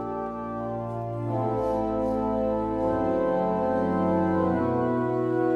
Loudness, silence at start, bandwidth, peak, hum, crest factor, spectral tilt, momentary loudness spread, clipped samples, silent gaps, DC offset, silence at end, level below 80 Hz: -26 LUFS; 0 s; 7.6 kHz; -12 dBFS; none; 14 dB; -9.5 dB/octave; 8 LU; under 0.1%; none; under 0.1%; 0 s; -48 dBFS